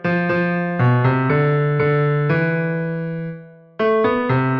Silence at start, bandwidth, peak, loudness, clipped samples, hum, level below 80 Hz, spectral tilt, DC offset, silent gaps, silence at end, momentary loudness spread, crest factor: 0 s; 5.6 kHz; -4 dBFS; -18 LUFS; under 0.1%; none; -54 dBFS; -10 dB/octave; under 0.1%; none; 0 s; 8 LU; 14 dB